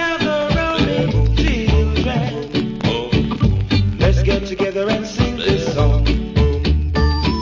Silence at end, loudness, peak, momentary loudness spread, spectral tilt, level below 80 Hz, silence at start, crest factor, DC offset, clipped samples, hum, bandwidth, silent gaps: 0 s; -18 LUFS; -2 dBFS; 4 LU; -6.5 dB/octave; -20 dBFS; 0 s; 14 dB; under 0.1%; under 0.1%; none; 7.6 kHz; none